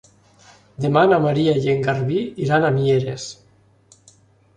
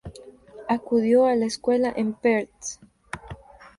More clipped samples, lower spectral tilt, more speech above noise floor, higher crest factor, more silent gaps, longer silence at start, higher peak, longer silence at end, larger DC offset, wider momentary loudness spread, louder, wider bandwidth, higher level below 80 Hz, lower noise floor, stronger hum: neither; first, -7 dB/octave vs -5 dB/octave; first, 36 dB vs 23 dB; about the same, 18 dB vs 16 dB; neither; first, 0.8 s vs 0.05 s; first, -2 dBFS vs -8 dBFS; first, 1.25 s vs 0.15 s; neither; second, 11 LU vs 23 LU; first, -19 LUFS vs -23 LUFS; second, 10 kHz vs 11.5 kHz; about the same, -56 dBFS vs -54 dBFS; first, -54 dBFS vs -45 dBFS; neither